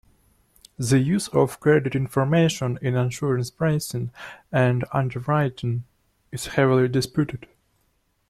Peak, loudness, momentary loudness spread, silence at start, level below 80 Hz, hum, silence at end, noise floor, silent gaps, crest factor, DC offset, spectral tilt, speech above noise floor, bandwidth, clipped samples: -6 dBFS; -23 LUFS; 11 LU; 0.8 s; -54 dBFS; none; 0.9 s; -68 dBFS; none; 18 dB; under 0.1%; -6.5 dB/octave; 46 dB; 14.5 kHz; under 0.1%